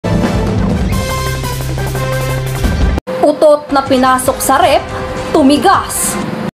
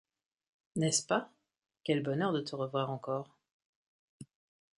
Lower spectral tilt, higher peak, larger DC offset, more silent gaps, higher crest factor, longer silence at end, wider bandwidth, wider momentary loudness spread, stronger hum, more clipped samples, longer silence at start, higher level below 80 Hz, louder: about the same, -5 dB/octave vs -4.5 dB/octave; first, 0 dBFS vs -16 dBFS; neither; second, 3.01-3.06 s vs 3.52-4.20 s; second, 12 dB vs 22 dB; second, 0.1 s vs 0.55 s; first, 16.5 kHz vs 11.5 kHz; second, 8 LU vs 12 LU; neither; neither; second, 0.05 s vs 0.75 s; first, -22 dBFS vs -76 dBFS; first, -13 LUFS vs -34 LUFS